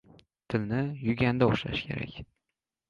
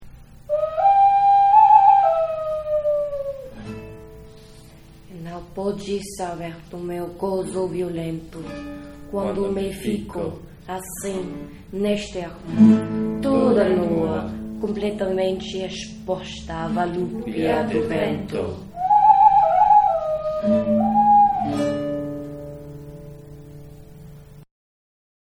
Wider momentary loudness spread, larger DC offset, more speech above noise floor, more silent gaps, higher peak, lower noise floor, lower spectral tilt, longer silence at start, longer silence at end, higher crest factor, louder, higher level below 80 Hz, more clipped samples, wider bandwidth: second, 12 LU vs 20 LU; neither; first, 58 dB vs 22 dB; neither; second, -10 dBFS vs -2 dBFS; first, -87 dBFS vs -45 dBFS; first, -8 dB/octave vs -6.5 dB/octave; first, 0.5 s vs 0 s; second, 0.65 s vs 0.9 s; about the same, 20 dB vs 20 dB; second, -29 LUFS vs -20 LUFS; second, -54 dBFS vs -46 dBFS; neither; second, 7.2 kHz vs 13.5 kHz